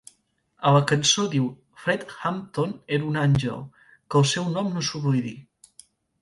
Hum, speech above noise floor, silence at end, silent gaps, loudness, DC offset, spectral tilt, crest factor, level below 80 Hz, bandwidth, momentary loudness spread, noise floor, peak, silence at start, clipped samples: none; 43 dB; 0.8 s; none; -24 LUFS; under 0.1%; -4.5 dB/octave; 20 dB; -56 dBFS; 11.5 kHz; 11 LU; -67 dBFS; -4 dBFS; 0.6 s; under 0.1%